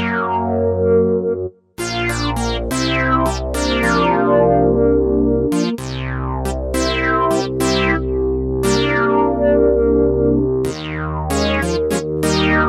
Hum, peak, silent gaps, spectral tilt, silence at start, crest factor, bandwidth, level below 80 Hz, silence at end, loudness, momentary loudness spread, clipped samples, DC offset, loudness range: none; -2 dBFS; none; -5.5 dB/octave; 0 s; 14 dB; 15 kHz; -28 dBFS; 0 s; -17 LUFS; 8 LU; under 0.1%; under 0.1%; 2 LU